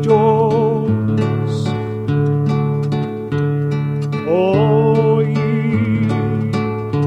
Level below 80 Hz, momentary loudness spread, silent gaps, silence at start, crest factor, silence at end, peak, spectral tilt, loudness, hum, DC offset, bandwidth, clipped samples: -48 dBFS; 7 LU; none; 0 s; 14 dB; 0 s; -2 dBFS; -9 dB/octave; -17 LUFS; none; under 0.1%; 8.2 kHz; under 0.1%